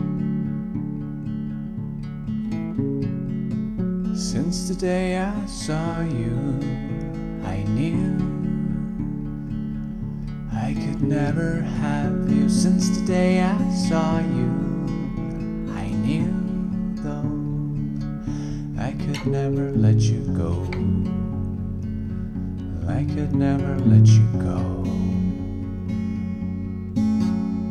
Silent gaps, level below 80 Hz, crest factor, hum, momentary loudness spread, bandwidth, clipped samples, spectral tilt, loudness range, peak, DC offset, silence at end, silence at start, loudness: none; -38 dBFS; 18 dB; none; 10 LU; 11.5 kHz; under 0.1%; -7.5 dB/octave; 6 LU; -6 dBFS; under 0.1%; 0 s; 0 s; -24 LUFS